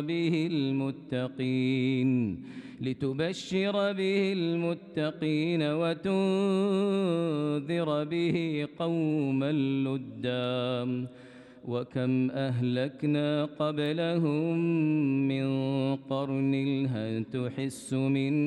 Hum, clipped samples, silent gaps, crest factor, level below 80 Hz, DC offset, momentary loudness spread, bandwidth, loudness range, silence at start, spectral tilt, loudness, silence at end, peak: none; under 0.1%; none; 12 dB; -70 dBFS; under 0.1%; 6 LU; 11.5 kHz; 3 LU; 0 s; -7.5 dB/octave; -29 LUFS; 0 s; -16 dBFS